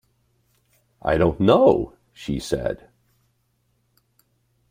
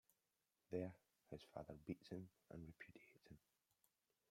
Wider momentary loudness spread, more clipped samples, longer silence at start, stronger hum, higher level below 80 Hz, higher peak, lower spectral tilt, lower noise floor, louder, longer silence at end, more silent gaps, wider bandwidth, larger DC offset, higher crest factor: about the same, 18 LU vs 17 LU; neither; first, 1.05 s vs 0.7 s; neither; first, -44 dBFS vs -80 dBFS; first, -2 dBFS vs -34 dBFS; about the same, -7 dB/octave vs -7.5 dB/octave; second, -68 dBFS vs under -90 dBFS; first, -21 LUFS vs -56 LUFS; first, 1.95 s vs 0.95 s; neither; about the same, 16 kHz vs 16 kHz; neither; about the same, 22 dB vs 24 dB